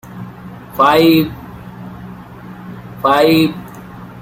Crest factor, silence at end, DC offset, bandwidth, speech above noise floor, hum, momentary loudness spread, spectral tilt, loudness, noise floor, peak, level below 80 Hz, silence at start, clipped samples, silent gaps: 16 dB; 0 s; under 0.1%; 16.5 kHz; 22 dB; none; 23 LU; -6 dB/octave; -12 LUFS; -33 dBFS; 0 dBFS; -46 dBFS; 0.05 s; under 0.1%; none